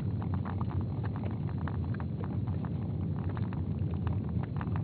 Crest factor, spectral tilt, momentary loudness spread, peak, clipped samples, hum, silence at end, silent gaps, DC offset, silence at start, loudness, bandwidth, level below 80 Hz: 14 dB; -9.5 dB/octave; 2 LU; -20 dBFS; under 0.1%; none; 0 s; none; under 0.1%; 0 s; -35 LUFS; 4.5 kHz; -46 dBFS